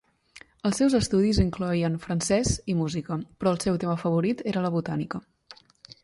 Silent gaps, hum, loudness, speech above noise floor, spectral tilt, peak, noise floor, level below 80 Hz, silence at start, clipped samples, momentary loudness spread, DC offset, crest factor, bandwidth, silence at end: none; none; -26 LUFS; 28 dB; -5.5 dB/octave; -8 dBFS; -53 dBFS; -42 dBFS; 0.65 s; under 0.1%; 9 LU; under 0.1%; 18 dB; 11.5 kHz; 0.1 s